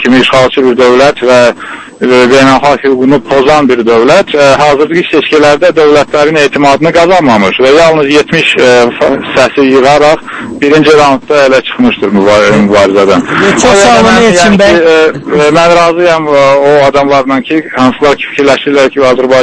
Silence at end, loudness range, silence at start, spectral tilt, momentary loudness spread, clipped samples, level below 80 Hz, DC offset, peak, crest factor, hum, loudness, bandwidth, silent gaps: 0 s; 2 LU; 0 s; -4.5 dB/octave; 5 LU; 7%; -36 dBFS; under 0.1%; 0 dBFS; 4 dB; none; -5 LUFS; 11 kHz; none